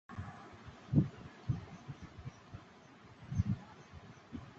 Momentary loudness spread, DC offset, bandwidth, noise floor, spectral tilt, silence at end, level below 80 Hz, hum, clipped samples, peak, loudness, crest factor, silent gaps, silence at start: 21 LU; under 0.1%; 7.6 kHz; -58 dBFS; -8.5 dB/octave; 0 s; -54 dBFS; none; under 0.1%; -16 dBFS; -40 LUFS; 24 dB; none; 0.1 s